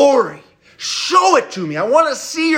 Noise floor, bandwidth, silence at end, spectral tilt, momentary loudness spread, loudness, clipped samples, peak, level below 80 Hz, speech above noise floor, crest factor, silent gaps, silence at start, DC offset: -40 dBFS; 16 kHz; 0 s; -3 dB/octave; 11 LU; -15 LUFS; under 0.1%; 0 dBFS; -66 dBFS; 25 dB; 14 dB; none; 0 s; under 0.1%